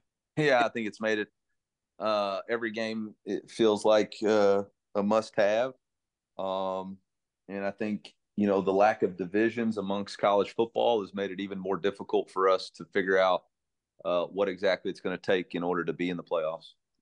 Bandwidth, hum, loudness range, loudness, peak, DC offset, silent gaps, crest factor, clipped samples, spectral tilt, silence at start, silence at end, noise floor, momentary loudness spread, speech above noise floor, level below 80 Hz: 11 kHz; none; 4 LU; -29 LUFS; -12 dBFS; under 0.1%; none; 18 dB; under 0.1%; -5.5 dB/octave; 0.35 s; 0.35 s; -88 dBFS; 11 LU; 60 dB; -78 dBFS